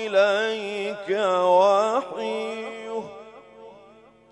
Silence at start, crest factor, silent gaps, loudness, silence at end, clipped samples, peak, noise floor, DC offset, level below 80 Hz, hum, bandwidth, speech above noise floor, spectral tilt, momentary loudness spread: 0 s; 16 dB; none; -23 LUFS; 0.55 s; under 0.1%; -8 dBFS; -52 dBFS; under 0.1%; -72 dBFS; 50 Hz at -65 dBFS; 10.5 kHz; 31 dB; -4 dB/octave; 15 LU